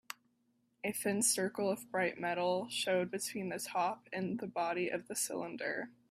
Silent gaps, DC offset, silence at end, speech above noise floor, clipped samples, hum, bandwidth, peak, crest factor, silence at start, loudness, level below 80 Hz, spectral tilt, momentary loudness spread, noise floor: none; under 0.1%; 0.2 s; 40 dB; under 0.1%; none; 16 kHz; -16 dBFS; 20 dB; 0.1 s; -36 LUFS; -80 dBFS; -3 dB/octave; 9 LU; -77 dBFS